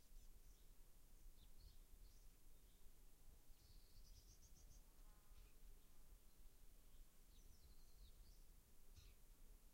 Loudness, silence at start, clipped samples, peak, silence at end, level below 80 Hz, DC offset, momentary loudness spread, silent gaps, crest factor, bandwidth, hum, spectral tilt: -70 LUFS; 0 s; under 0.1%; -52 dBFS; 0 s; -66 dBFS; under 0.1%; 1 LU; none; 12 dB; 16 kHz; none; -3.5 dB/octave